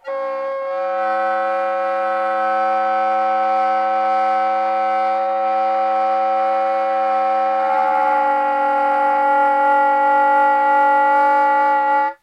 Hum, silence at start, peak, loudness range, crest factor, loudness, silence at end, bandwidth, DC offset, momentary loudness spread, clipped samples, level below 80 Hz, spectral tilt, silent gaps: none; 0.05 s; -6 dBFS; 4 LU; 10 dB; -17 LUFS; 0.1 s; 9.6 kHz; under 0.1%; 5 LU; under 0.1%; -84 dBFS; -4 dB/octave; none